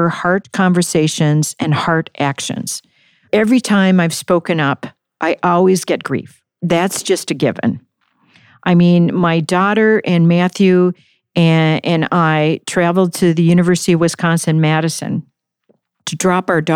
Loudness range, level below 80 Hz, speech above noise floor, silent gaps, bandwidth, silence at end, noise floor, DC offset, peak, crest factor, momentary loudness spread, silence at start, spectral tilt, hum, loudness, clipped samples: 3 LU; -56 dBFS; 46 dB; none; 15 kHz; 0 s; -60 dBFS; under 0.1%; -2 dBFS; 12 dB; 10 LU; 0 s; -5.5 dB/octave; none; -14 LUFS; under 0.1%